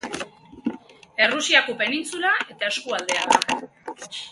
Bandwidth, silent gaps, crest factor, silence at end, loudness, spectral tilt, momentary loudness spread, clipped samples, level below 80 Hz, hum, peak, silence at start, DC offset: 12 kHz; none; 24 dB; 0 s; -22 LUFS; -1 dB/octave; 17 LU; under 0.1%; -64 dBFS; none; 0 dBFS; 0.05 s; under 0.1%